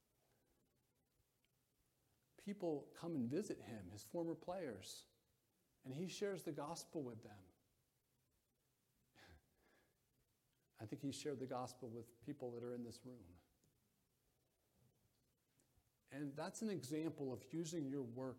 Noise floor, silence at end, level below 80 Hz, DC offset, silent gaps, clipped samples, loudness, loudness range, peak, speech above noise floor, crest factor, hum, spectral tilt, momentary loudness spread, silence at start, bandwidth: -85 dBFS; 0 s; -84 dBFS; under 0.1%; none; under 0.1%; -49 LUFS; 10 LU; -32 dBFS; 37 dB; 20 dB; none; -5.5 dB/octave; 14 LU; 2.4 s; 16.5 kHz